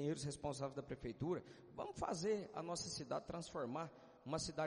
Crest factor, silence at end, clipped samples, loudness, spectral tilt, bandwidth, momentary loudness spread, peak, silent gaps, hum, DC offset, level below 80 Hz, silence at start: 18 dB; 0 s; under 0.1%; -46 LUFS; -5 dB/octave; 10.5 kHz; 8 LU; -28 dBFS; none; none; under 0.1%; -68 dBFS; 0 s